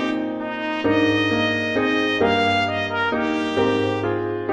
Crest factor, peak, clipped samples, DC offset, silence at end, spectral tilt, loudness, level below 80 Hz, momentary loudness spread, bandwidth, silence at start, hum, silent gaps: 14 dB; -6 dBFS; under 0.1%; under 0.1%; 0 s; -5.5 dB/octave; -21 LUFS; -54 dBFS; 6 LU; 9.2 kHz; 0 s; none; none